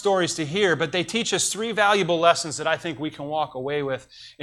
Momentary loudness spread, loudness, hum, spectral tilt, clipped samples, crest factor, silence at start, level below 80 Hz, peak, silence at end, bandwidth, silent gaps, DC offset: 9 LU; -23 LUFS; none; -3 dB/octave; under 0.1%; 20 dB; 0 s; -64 dBFS; -4 dBFS; 0 s; 16.5 kHz; none; under 0.1%